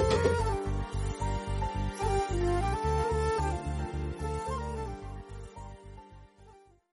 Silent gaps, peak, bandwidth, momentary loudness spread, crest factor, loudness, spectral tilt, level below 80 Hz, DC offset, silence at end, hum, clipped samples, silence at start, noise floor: none; -14 dBFS; 11.5 kHz; 17 LU; 18 dB; -32 LUFS; -6 dB/octave; -38 dBFS; under 0.1%; 0.35 s; none; under 0.1%; 0 s; -57 dBFS